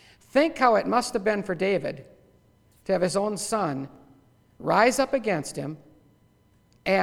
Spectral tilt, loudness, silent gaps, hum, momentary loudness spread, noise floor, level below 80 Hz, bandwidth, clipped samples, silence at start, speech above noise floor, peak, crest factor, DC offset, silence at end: -4.5 dB/octave; -25 LUFS; none; none; 15 LU; -61 dBFS; -58 dBFS; 17 kHz; under 0.1%; 0.35 s; 37 dB; -4 dBFS; 22 dB; under 0.1%; 0 s